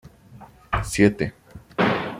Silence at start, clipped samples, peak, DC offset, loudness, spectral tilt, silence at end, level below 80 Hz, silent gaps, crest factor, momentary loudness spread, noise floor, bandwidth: 0.3 s; under 0.1%; -2 dBFS; under 0.1%; -23 LUFS; -5.5 dB/octave; 0 s; -42 dBFS; none; 22 dB; 11 LU; -47 dBFS; 16 kHz